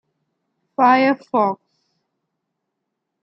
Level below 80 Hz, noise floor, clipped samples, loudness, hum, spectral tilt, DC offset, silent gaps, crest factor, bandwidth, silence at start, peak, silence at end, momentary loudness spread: -78 dBFS; -78 dBFS; under 0.1%; -17 LUFS; none; -7 dB/octave; under 0.1%; none; 18 dB; 6.2 kHz; 0.8 s; -4 dBFS; 1.7 s; 17 LU